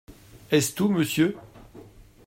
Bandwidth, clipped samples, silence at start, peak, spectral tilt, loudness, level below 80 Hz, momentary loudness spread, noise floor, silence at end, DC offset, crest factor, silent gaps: 16 kHz; under 0.1%; 0.1 s; -8 dBFS; -5 dB/octave; -24 LUFS; -56 dBFS; 3 LU; -48 dBFS; 0.45 s; under 0.1%; 20 dB; none